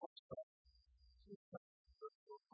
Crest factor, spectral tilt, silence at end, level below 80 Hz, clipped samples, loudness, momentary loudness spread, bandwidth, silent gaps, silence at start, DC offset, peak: 22 dB; -5.5 dB/octave; 0.15 s; -78 dBFS; under 0.1%; -59 LUFS; 8 LU; 5 kHz; 0.06-0.29 s, 0.43-0.65 s, 1.36-1.85 s, 2.15-2.27 s; 0 s; under 0.1%; -36 dBFS